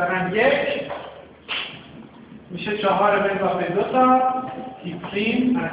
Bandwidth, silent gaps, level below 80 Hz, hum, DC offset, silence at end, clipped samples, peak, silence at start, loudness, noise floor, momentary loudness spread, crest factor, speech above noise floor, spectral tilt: 4 kHz; none; -56 dBFS; none; under 0.1%; 0 s; under 0.1%; -6 dBFS; 0 s; -21 LUFS; -43 dBFS; 16 LU; 16 dB; 23 dB; -9 dB/octave